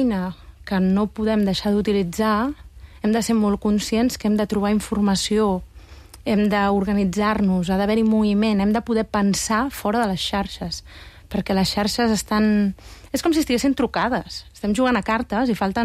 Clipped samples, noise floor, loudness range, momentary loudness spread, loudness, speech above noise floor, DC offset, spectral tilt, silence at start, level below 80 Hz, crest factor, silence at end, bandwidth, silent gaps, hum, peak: under 0.1%; -43 dBFS; 2 LU; 9 LU; -21 LUFS; 22 dB; under 0.1%; -5.5 dB/octave; 0 s; -42 dBFS; 12 dB; 0 s; 15.5 kHz; none; none; -10 dBFS